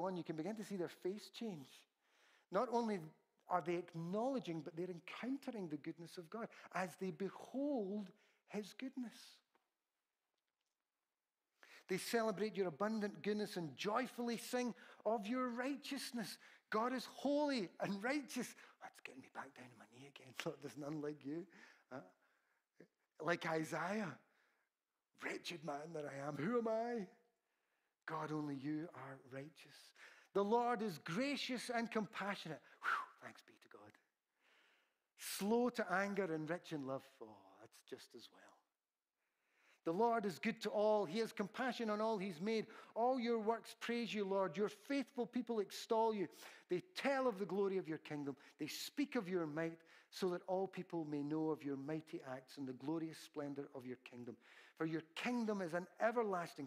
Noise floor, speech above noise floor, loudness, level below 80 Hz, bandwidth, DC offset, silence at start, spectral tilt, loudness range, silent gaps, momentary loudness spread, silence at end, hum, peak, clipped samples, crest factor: under -90 dBFS; over 47 dB; -43 LUFS; under -90 dBFS; 15.5 kHz; under 0.1%; 0 s; -5 dB/octave; 8 LU; none; 17 LU; 0 s; none; -24 dBFS; under 0.1%; 20 dB